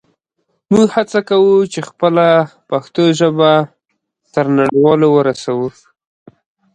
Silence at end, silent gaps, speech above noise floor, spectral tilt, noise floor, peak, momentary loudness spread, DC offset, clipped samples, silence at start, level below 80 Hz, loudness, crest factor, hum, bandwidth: 1.05 s; none; 58 dB; -6 dB/octave; -70 dBFS; 0 dBFS; 10 LU; under 0.1%; under 0.1%; 0.7 s; -56 dBFS; -13 LUFS; 14 dB; none; 9.6 kHz